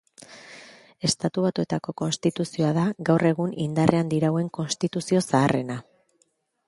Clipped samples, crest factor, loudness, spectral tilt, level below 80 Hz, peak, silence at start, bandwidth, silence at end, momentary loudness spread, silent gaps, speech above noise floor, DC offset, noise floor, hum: under 0.1%; 24 dB; -24 LUFS; -5.5 dB/octave; -60 dBFS; 0 dBFS; 0.3 s; 11.5 kHz; 0.85 s; 14 LU; none; 45 dB; under 0.1%; -69 dBFS; none